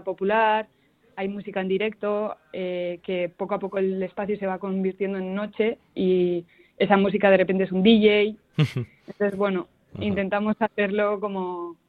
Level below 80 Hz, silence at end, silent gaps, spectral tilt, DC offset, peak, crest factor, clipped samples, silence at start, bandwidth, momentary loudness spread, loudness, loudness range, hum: -60 dBFS; 0.15 s; none; -8 dB/octave; under 0.1%; -2 dBFS; 22 dB; under 0.1%; 0.05 s; 6.6 kHz; 12 LU; -24 LUFS; 7 LU; none